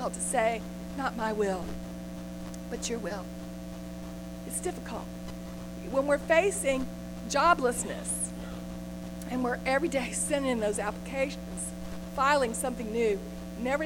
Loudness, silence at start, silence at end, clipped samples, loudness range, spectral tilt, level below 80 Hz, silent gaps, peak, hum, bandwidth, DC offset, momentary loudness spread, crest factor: -31 LUFS; 0 s; 0 s; under 0.1%; 9 LU; -4 dB/octave; -48 dBFS; none; -10 dBFS; 60 Hz at -40 dBFS; 17.5 kHz; under 0.1%; 15 LU; 20 dB